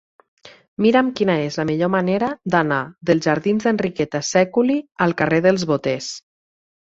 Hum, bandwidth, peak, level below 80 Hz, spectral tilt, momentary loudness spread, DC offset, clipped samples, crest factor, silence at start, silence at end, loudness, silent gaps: none; 8 kHz; -2 dBFS; -58 dBFS; -5.5 dB/octave; 6 LU; under 0.1%; under 0.1%; 18 dB; 0.45 s; 0.65 s; -19 LUFS; 0.68-0.77 s